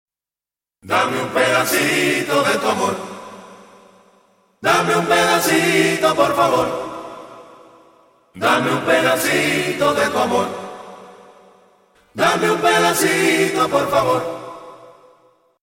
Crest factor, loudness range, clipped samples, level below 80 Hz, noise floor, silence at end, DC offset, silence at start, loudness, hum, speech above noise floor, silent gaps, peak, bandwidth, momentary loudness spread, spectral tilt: 16 dB; 3 LU; under 0.1%; -58 dBFS; under -90 dBFS; 0.75 s; under 0.1%; 0.85 s; -17 LUFS; none; over 73 dB; none; -2 dBFS; 16.5 kHz; 18 LU; -3.5 dB/octave